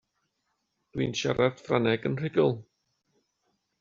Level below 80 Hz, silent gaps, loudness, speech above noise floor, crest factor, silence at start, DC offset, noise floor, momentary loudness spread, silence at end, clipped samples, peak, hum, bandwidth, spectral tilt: -62 dBFS; none; -27 LUFS; 52 dB; 22 dB; 0.95 s; under 0.1%; -79 dBFS; 7 LU; 1.2 s; under 0.1%; -8 dBFS; none; 7.6 kHz; -5 dB/octave